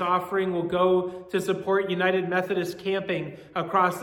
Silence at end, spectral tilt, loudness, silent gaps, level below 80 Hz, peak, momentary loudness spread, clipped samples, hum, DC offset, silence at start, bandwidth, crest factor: 0 s; -6 dB/octave; -26 LUFS; none; -64 dBFS; -8 dBFS; 7 LU; under 0.1%; none; under 0.1%; 0 s; 18 kHz; 16 dB